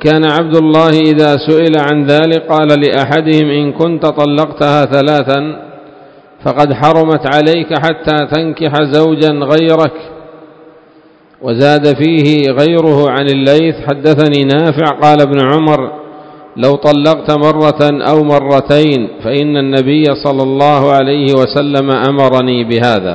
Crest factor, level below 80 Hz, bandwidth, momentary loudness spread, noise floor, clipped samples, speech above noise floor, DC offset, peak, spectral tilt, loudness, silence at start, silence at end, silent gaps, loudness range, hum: 10 dB; -46 dBFS; 8 kHz; 5 LU; -43 dBFS; 1%; 34 dB; under 0.1%; 0 dBFS; -7.5 dB/octave; -9 LUFS; 0 s; 0 s; none; 3 LU; none